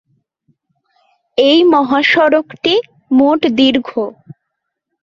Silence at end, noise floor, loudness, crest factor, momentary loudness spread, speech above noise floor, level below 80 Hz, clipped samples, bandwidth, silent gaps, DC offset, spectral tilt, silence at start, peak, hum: 0.95 s; -75 dBFS; -12 LUFS; 14 dB; 12 LU; 63 dB; -56 dBFS; under 0.1%; 7.2 kHz; none; under 0.1%; -5 dB/octave; 1.35 s; 0 dBFS; none